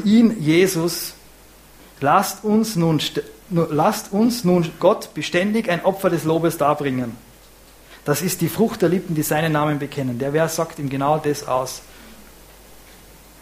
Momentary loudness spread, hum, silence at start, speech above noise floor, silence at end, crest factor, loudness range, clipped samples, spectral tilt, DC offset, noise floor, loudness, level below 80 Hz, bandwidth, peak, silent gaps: 8 LU; none; 0 s; 27 dB; 0.65 s; 18 dB; 3 LU; under 0.1%; -5.5 dB/octave; under 0.1%; -47 dBFS; -20 LUFS; -52 dBFS; 15.5 kHz; -2 dBFS; none